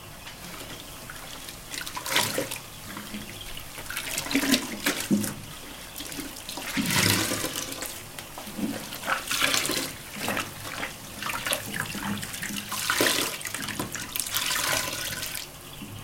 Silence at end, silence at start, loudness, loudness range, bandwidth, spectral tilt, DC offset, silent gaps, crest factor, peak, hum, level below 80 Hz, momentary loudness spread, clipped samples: 0 s; 0 s; -28 LUFS; 4 LU; 17 kHz; -2 dB/octave; under 0.1%; none; 26 dB; -4 dBFS; none; -52 dBFS; 15 LU; under 0.1%